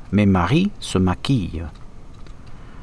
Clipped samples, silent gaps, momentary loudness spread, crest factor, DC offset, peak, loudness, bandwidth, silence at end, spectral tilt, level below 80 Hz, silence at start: under 0.1%; none; 14 LU; 14 dB; under 0.1%; -6 dBFS; -20 LUFS; 11 kHz; 0 s; -6.5 dB/octave; -38 dBFS; 0 s